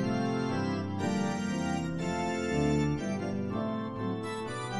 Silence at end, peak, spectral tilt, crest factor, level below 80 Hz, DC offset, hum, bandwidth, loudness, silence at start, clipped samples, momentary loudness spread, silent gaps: 0 s; -16 dBFS; -6.5 dB/octave; 14 dB; -52 dBFS; under 0.1%; none; 12 kHz; -32 LUFS; 0 s; under 0.1%; 6 LU; none